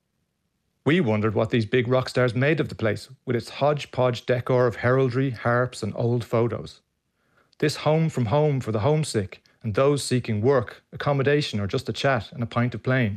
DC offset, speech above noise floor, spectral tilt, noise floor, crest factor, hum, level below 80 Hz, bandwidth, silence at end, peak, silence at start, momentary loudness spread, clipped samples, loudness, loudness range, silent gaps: under 0.1%; 51 dB; -6.5 dB/octave; -74 dBFS; 14 dB; none; -58 dBFS; 13.5 kHz; 0 s; -10 dBFS; 0.85 s; 7 LU; under 0.1%; -24 LUFS; 2 LU; none